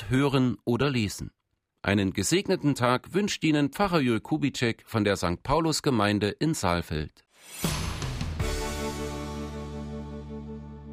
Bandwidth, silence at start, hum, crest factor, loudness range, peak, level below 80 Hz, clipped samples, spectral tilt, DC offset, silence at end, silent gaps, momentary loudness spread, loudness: 16 kHz; 0 s; none; 18 dB; 7 LU; -10 dBFS; -44 dBFS; under 0.1%; -5 dB/octave; under 0.1%; 0 s; none; 14 LU; -27 LUFS